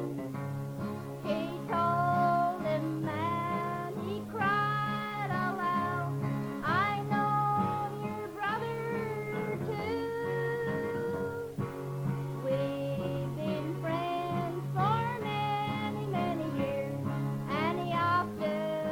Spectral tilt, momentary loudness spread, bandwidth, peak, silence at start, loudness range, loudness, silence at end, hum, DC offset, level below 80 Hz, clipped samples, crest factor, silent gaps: -7 dB/octave; 8 LU; 17 kHz; -16 dBFS; 0 s; 3 LU; -32 LUFS; 0 s; none; under 0.1%; -62 dBFS; under 0.1%; 16 dB; none